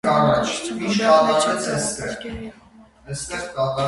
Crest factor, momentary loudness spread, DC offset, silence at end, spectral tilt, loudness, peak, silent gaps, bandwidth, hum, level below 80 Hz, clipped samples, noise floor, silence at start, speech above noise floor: 18 dB; 17 LU; under 0.1%; 0 s; -4 dB/octave; -20 LUFS; -2 dBFS; none; 11.5 kHz; none; -48 dBFS; under 0.1%; -46 dBFS; 0.05 s; 26 dB